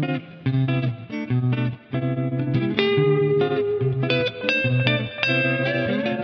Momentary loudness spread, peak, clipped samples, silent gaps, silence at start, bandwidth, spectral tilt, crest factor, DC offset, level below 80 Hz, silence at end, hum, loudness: 7 LU; 0 dBFS; under 0.1%; none; 0 s; 6.2 kHz; -8 dB/octave; 22 dB; under 0.1%; -56 dBFS; 0 s; none; -22 LUFS